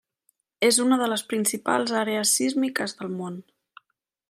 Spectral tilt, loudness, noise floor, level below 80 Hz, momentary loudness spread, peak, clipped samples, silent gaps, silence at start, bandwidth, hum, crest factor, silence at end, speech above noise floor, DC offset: -2.5 dB/octave; -23 LUFS; -78 dBFS; -78 dBFS; 12 LU; -8 dBFS; under 0.1%; none; 0.6 s; 16 kHz; none; 18 dB; 0.9 s; 54 dB; under 0.1%